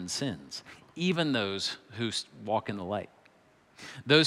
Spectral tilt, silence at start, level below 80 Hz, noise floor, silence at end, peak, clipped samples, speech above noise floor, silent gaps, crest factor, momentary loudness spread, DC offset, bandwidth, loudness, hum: -4 dB/octave; 0 s; -74 dBFS; -63 dBFS; 0 s; -10 dBFS; under 0.1%; 32 dB; none; 22 dB; 17 LU; under 0.1%; 14 kHz; -32 LUFS; none